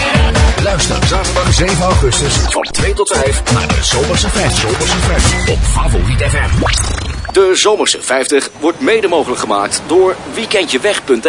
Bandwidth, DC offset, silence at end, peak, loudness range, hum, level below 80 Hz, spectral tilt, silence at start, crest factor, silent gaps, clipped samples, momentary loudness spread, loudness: 11 kHz; under 0.1%; 0 s; 0 dBFS; 1 LU; none; -18 dBFS; -4 dB/octave; 0 s; 12 dB; none; under 0.1%; 4 LU; -12 LUFS